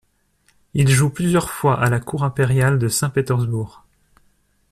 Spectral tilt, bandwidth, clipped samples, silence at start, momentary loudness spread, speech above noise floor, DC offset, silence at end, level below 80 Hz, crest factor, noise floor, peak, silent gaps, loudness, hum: -5.5 dB/octave; 13.5 kHz; under 0.1%; 0.75 s; 8 LU; 44 dB; under 0.1%; 1 s; -46 dBFS; 16 dB; -62 dBFS; -4 dBFS; none; -19 LUFS; none